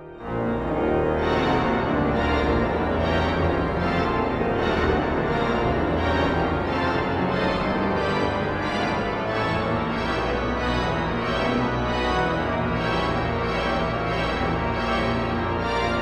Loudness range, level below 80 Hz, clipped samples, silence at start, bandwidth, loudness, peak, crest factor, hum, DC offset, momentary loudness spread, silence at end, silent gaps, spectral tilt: 2 LU; -36 dBFS; under 0.1%; 0 s; 11 kHz; -23 LUFS; -8 dBFS; 14 dB; none; under 0.1%; 3 LU; 0 s; none; -7 dB/octave